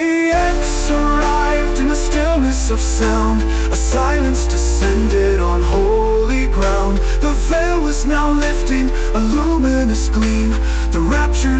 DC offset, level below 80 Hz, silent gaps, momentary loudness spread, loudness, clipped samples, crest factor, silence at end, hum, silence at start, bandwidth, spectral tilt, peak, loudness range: under 0.1%; -16 dBFS; none; 3 LU; -17 LUFS; under 0.1%; 10 dB; 0 s; none; 0 s; 8.8 kHz; -5.5 dB/octave; -6 dBFS; 1 LU